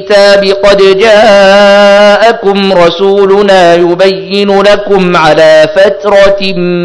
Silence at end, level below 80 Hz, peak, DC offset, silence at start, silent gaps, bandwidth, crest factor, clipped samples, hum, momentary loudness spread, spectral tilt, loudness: 0 s; -34 dBFS; 0 dBFS; under 0.1%; 0 s; none; 11 kHz; 4 dB; 30%; none; 5 LU; -5 dB/octave; -4 LUFS